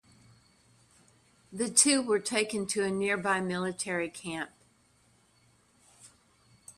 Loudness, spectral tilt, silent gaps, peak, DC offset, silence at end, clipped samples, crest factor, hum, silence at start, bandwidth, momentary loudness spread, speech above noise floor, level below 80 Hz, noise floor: -28 LUFS; -2.5 dB/octave; none; -8 dBFS; under 0.1%; 0.05 s; under 0.1%; 26 dB; none; 1.5 s; 14.5 kHz; 15 LU; 37 dB; -72 dBFS; -66 dBFS